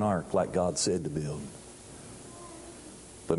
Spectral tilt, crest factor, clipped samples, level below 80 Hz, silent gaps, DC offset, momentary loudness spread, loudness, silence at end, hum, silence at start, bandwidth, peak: -5 dB/octave; 22 dB; under 0.1%; -54 dBFS; none; under 0.1%; 19 LU; -30 LUFS; 0 s; none; 0 s; 11.5 kHz; -10 dBFS